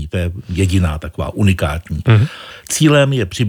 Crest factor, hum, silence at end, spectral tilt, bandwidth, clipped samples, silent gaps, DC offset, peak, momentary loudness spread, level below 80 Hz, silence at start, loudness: 14 dB; none; 0 s; -5.5 dB/octave; 16.5 kHz; under 0.1%; none; under 0.1%; -2 dBFS; 10 LU; -34 dBFS; 0 s; -16 LUFS